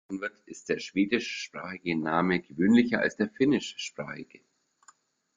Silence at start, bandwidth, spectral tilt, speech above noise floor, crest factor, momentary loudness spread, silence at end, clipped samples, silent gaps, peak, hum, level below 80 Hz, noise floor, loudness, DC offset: 0.1 s; 7.6 kHz; -5.5 dB/octave; 33 dB; 20 dB; 15 LU; 1.15 s; under 0.1%; none; -10 dBFS; none; -66 dBFS; -62 dBFS; -28 LUFS; under 0.1%